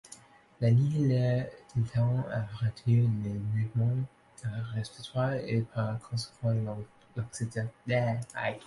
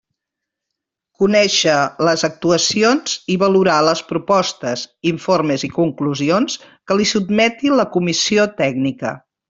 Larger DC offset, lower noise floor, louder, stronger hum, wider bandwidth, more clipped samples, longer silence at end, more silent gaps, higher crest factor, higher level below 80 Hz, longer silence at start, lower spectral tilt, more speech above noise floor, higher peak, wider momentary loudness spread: neither; second, -54 dBFS vs -82 dBFS; second, -31 LUFS vs -16 LUFS; neither; first, 11.5 kHz vs 8 kHz; neither; second, 0 s vs 0.3 s; neither; about the same, 16 dB vs 16 dB; about the same, -60 dBFS vs -56 dBFS; second, 0.05 s vs 1.2 s; first, -7.5 dB/octave vs -4 dB/octave; second, 25 dB vs 65 dB; second, -14 dBFS vs -2 dBFS; first, 12 LU vs 8 LU